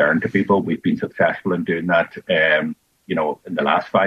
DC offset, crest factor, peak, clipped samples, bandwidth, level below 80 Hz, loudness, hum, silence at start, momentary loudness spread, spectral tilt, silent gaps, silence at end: under 0.1%; 16 dB; -4 dBFS; under 0.1%; 7.6 kHz; -60 dBFS; -20 LUFS; none; 0 s; 6 LU; -7.5 dB/octave; none; 0 s